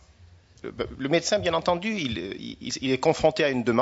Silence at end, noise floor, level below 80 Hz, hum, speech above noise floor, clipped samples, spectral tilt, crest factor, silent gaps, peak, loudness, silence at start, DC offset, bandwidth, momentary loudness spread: 0 s; -53 dBFS; -52 dBFS; none; 28 dB; under 0.1%; -4.5 dB/octave; 20 dB; none; -6 dBFS; -26 LUFS; 0.2 s; under 0.1%; 8 kHz; 13 LU